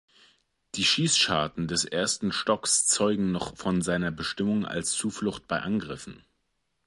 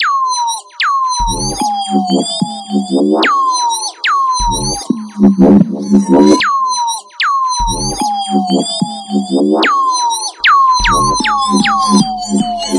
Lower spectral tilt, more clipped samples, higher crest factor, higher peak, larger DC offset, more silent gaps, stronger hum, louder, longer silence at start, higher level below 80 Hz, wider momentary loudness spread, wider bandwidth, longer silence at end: about the same, -3 dB/octave vs -4 dB/octave; neither; first, 18 dB vs 12 dB; second, -10 dBFS vs 0 dBFS; neither; neither; neither; second, -26 LUFS vs -12 LUFS; first, 0.75 s vs 0 s; second, -56 dBFS vs -30 dBFS; about the same, 10 LU vs 8 LU; about the same, 11.5 kHz vs 11.5 kHz; first, 0.7 s vs 0 s